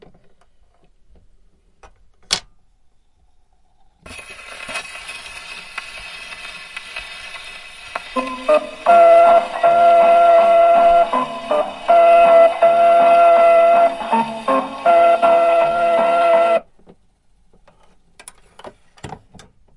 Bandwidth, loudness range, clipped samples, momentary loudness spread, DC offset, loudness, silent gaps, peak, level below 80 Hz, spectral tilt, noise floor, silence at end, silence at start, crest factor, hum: 11.5 kHz; 19 LU; under 0.1%; 21 LU; under 0.1%; -13 LUFS; none; 0 dBFS; -52 dBFS; -3.5 dB/octave; -55 dBFS; 0.65 s; 2.3 s; 16 dB; none